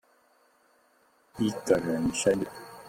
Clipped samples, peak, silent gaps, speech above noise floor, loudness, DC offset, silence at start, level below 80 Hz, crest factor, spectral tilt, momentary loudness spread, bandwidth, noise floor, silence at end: under 0.1%; -10 dBFS; none; 38 dB; -28 LUFS; under 0.1%; 1.35 s; -58 dBFS; 22 dB; -5 dB/octave; 10 LU; 16.5 kHz; -65 dBFS; 0 s